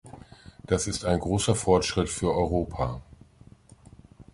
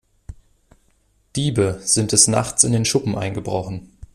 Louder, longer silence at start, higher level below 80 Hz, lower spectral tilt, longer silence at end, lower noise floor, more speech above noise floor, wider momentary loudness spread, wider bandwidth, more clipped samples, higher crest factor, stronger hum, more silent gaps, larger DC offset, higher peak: second, -26 LUFS vs -18 LUFS; second, 0.05 s vs 0.3 s; about the same, -42 dBFS vs -46 dBFS; first, -5 dB/octave vs -3.5 dB/octave; about the same, 0.1 s vs 0.1 s; second, -53 dBFS vs -61 dBFS; second, 28 dB vs 42 dB; first, 20 LU vs 13 LU; second, 11.5 kHz vs 14.5 kHz; neither; about the same, 22 dB vs 22 dB; neither; neither; neither; second, -6 dBFS vs 0 dBFS